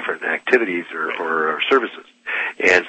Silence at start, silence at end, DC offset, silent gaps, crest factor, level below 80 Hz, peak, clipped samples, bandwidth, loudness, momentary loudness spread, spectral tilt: 0 s; 0 s; under 0.1%; none; 20 dB; -66 dBFS; 0 dBFS; under 0.1%; 8.6 kHz; -20 LUFS; 8 LU; -3 dB/octave